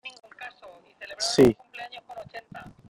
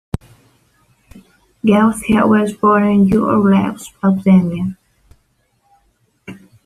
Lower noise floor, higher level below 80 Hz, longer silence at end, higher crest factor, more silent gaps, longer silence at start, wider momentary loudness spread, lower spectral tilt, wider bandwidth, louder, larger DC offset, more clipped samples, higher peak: second, -51 dBFS vs -61 dBFS; second, -56 dBFS vs -44 dBFS; about the same, 0.2 s vs 0.3 s; first, 22 dB vs 16 dB; neither; second, 0.05 s vs 1.65 s; first, 23 LU vs 11 LU; second, -4.5 dB/octave vs -7.5 dB/octave; first, 16 kHz vs 13 kHz; second, -22 LUFS vs -14 LUFS; neither; neither; second, -6 dBFS vs 0 dBFS